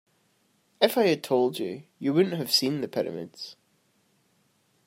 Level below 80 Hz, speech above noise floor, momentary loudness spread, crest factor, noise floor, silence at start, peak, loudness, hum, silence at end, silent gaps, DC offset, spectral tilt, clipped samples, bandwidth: -76 dBFS; 42 dB; 15 LU; 22 dB; -68 dBFS; 0.8 s; -6 dBFS; -26 LUFS; none; 1.35 s; none; under 0.1%; -4.5 dB/octave; under 0.1%; 16 kHz